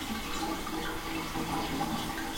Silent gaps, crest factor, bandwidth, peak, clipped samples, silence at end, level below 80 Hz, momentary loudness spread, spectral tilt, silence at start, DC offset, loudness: none; 14 dB; 16.5 kHz; -20 dBFS; under 0.1%; 0 s; -46 dBFS; 2 LU; -3.5 dB/octave; 0 s; under 0.1%; -34 LUFS